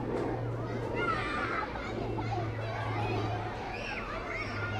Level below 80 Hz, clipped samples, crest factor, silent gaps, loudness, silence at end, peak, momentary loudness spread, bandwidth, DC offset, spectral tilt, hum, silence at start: -48 dBFS; under 0.1%; 14 dB; none; -34 LUFS; 0 s; -20 dBFS; 5 LU; 9.8 kHz; under 0.1%; -6.5 dB/octave; none; 0 s